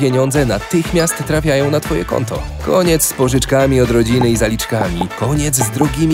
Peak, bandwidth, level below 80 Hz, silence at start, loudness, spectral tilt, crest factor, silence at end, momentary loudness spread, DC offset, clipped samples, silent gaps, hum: 0 dBFS; 16.5 kHz; -28 dBFS; 0 s; -15 LUFS; -5 dB/octave; 14 dB; 0 s; 6 LU; 0.1%; under 0.1%; none; none